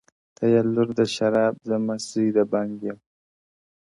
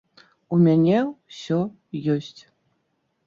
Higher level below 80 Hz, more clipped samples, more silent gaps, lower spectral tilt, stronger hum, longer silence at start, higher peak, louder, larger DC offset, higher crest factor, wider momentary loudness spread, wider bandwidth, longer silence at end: about the same, -66 dBFS vs -66 dBFS; neither; neither; second, -6 dB/octave vs -8.5 dB/octave; neither; about the same, 0.4 s vs 0.5 s; about the same, -8 dBFS vs -8 dBFS; about the same, -23 LUFS vs -22 LUFS; neither; about the same, 16 dB vs 16 dB; second, 10 LU vs 13 LU; first, 11.5 kHz vs 7.2 kHz; about the same, 1.05 s vs 0.95 s